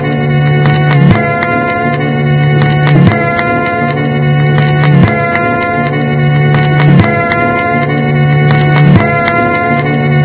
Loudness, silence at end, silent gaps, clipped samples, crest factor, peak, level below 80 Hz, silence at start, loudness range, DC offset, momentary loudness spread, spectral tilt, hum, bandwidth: -9 LUFS; 0 s; none; 1%; 8 dB; 0 dBFS; -32 dBFS; 0 s; 1 LU; under 0.1%; 5 LU; -11 dB/octave; none; 4 kHz